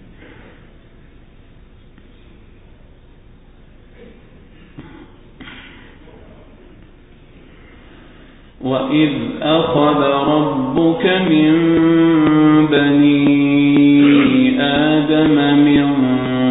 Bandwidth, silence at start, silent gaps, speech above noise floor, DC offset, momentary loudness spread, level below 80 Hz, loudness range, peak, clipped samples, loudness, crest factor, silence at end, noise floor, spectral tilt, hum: 4 kHz; 4 s; none; 30 dB; under 0.1%; 7 LU; -44 dBFS; 11 LU; -2 dBFS; under 0.1%; -13 LUFS; 14 dB; 0 s; -43 dBFS; -12 dB/octave; none